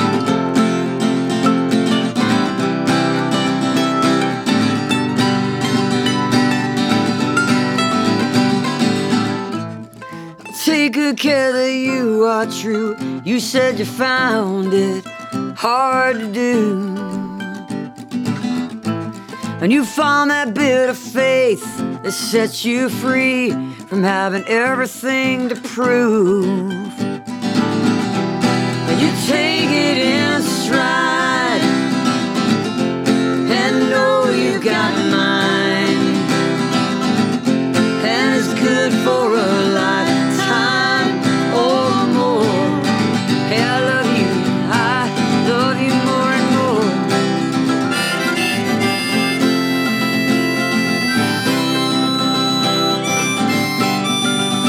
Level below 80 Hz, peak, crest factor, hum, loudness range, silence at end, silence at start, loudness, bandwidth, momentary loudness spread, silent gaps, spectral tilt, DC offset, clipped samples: -58 dBFS; -2 dBFS; 14 dB; none; 3 LU; 0 s; 0 s; -16 LUFS; 17 kHz; 6 LU; none; -4.5 dB/octave; under 0.1%; under 0.1%